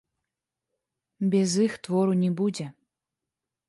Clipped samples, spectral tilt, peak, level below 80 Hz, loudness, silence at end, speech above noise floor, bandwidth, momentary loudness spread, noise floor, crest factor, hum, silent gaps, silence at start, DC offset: under 0.1%; -6 dB/octave; -12 dBFS; -74 dBFS; -25 LUFS; 0.95 s; 63 dB; 11.5 kHz; 9 LU; -88 dBFS; 16 dB; none; none; 1.2 s; under 0.1%